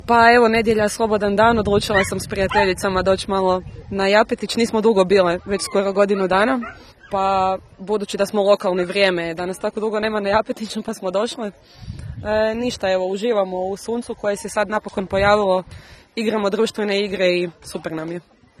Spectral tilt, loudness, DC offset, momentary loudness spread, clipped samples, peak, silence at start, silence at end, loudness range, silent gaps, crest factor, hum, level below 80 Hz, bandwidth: -4.5 dB/octave; -19 LUFS; under 0.1%; 12 LU; under 0.1%; 0 dBFS; 0.05 s; 0.4 s; 5 LU; none; 18 dB; none; -44 dBFS; 13 kHz